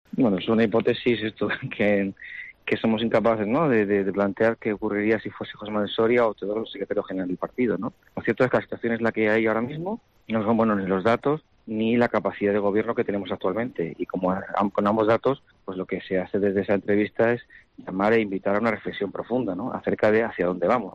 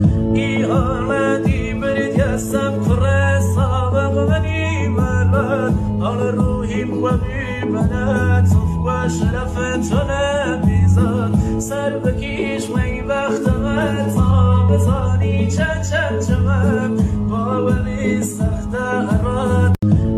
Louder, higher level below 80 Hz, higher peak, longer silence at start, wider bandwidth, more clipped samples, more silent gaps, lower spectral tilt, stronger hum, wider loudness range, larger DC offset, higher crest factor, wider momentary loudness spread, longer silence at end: second, -24 LUFS vs -18 LUFS; second, -60 dBFS vs -28 dBFS; second, -10 dBFS vs -2 dBFS; first, 0.15 s vs 0 s; second, 7.4 kHz vs 13 kHz; neither; neither; about the same, -8 dB/octave vs -7 dB/octave; neither; about the same, 2 LU vs 2 LU; neither; about the same, 14 dB vs 14 dB; first, 9 LU vs 5 LU; about the same, 0 s vs 0 s